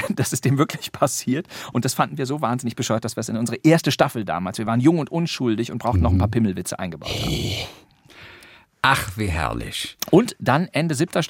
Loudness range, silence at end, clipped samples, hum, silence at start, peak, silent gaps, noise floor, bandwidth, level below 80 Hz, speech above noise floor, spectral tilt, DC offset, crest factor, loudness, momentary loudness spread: 4 LU; 0 s; under 0.1%; none; 0 s; -2 dBFS; none; -48 dBFS; 17 kHz; -44 dBFS; 27 dB; -5 dB/octave; under 0.1%; 20 dB; -22 LUFS; 9 LU